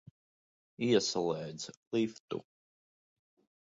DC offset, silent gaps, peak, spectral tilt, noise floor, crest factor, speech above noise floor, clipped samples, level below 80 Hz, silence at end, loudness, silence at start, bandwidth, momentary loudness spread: under 0.1%; 1.77-1.91 s, 2.20-2.28 s; -16 dBFS; -4.5 dB/octave; under -90 dBFS; 22 dB; over 57 dB; under 0.1%; -76 dBFS; 1.2 s; -34 LUFS; 0.8 s; 7.8 kHz; 14 LU